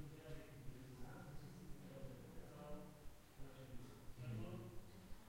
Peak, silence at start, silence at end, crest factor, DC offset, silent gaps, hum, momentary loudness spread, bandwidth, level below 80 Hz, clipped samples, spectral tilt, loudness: -38 dBFS; 0 s; 0 s; 16 dB; under 0.1%; none; none; 9 LU; 16 kHz; -62 dBFS; under 0.1%; -6.5 dB/octave; -57 LUFS